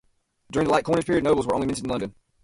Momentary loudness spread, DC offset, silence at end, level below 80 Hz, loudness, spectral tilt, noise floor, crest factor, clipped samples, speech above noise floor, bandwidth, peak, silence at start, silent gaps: 9 LU; under 0.1%; 0.35 s; -48 dBFS; -24 LUFS; -5.5 dB/octave; -55 dBFS; 18 dB; under 0.1%; 32 dB; 11.5 kHz; -6 dBFS; 0.5 s; none